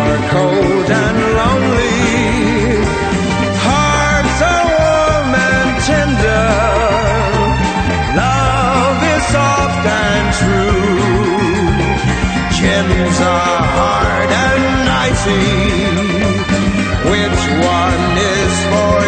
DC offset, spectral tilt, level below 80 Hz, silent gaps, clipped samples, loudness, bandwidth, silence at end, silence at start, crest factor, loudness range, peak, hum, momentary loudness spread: under 0.1%; -5 dB/octave; -24 dBFS; none; under 0.1%; -13 LUFS; 9.2 kHz; 0 s; 0 s; 12 dB; 1 LU; 0 dBFS; none; 2 LU